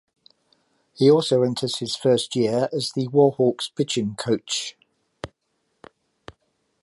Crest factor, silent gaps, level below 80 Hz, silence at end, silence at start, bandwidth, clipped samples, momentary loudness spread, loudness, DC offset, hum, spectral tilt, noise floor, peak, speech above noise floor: 20 dB; none; -62 dBFS; 1.55 s; 1 s; 11.5 kHz; under 0.1%; 15 LU; -22 LUFS; under 0.1%; none; -5 dB/octave; -73 dBFS; -4 dBFS; 52 dB